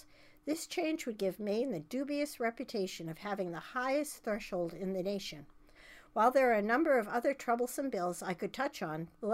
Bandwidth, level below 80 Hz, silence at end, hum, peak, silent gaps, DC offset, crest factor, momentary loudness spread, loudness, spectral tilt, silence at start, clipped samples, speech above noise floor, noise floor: 16 kHz; -66 dBFS; 0 s; none; -16 dBFS; none; under 0.1%; 20 dB; 11 LU; -35 LUFS; -4.5 dB/octave; 0.25 s; under 0.1%; 23 dB; -58 dBFS